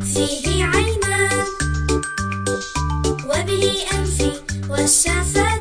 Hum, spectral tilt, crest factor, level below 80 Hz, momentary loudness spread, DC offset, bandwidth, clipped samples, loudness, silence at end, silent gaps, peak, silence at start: none; -3.5 dB/octave; 16 dB; -28 dBFS; 8 LU; under 0.1%; 10.5 kHz; under 0.1%; -19 LUFS; 0 s; none; -2 dBFS; 0 s